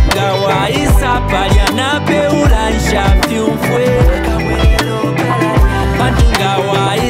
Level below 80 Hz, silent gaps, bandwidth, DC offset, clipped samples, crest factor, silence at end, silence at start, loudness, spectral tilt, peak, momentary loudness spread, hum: -16 dBFS; none; 16 kHz; under 0.1%; under 0.1%; 10 dB; 0 s; 0 s; -12 LUFS; -5.5 dB/octave; 0 dBFS; 3 LU; none